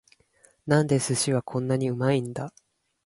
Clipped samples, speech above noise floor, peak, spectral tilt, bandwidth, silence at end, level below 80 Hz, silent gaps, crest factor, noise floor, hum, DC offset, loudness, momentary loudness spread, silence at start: under 0.1%; 37 dB; -8 dBFS; -5.5 dB/octave; 11.5 kHz; 0.55 s; -62 dBFS; none; 18 dB; -62 dBFS; none; under 0.1%; -25 LUFS; 14 LU; 0.65 s